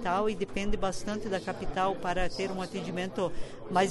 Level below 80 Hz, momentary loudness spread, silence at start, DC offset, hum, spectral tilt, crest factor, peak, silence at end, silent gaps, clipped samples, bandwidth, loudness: -42 dBFS; 5 LU; 0 s; under 0.1%; none; -5 dB/octave; 16 dB; -14 dBFS; 0 s; none; under 0.1%; 11.5 kHz; -32 LUFS